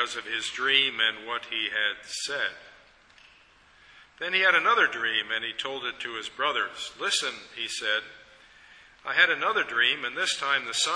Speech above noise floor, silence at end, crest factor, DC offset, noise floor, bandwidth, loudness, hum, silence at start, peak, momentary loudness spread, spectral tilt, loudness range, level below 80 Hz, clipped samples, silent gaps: 30 dB; 0 s; 22 dB; under 0.1%; -58 dBFS; 11 kHz; -26 LUFS; none; 0 s; -6 dBFS; 12 LU; 0 dB/octave; 5 LU; -70 dBFS; under 0.1%; none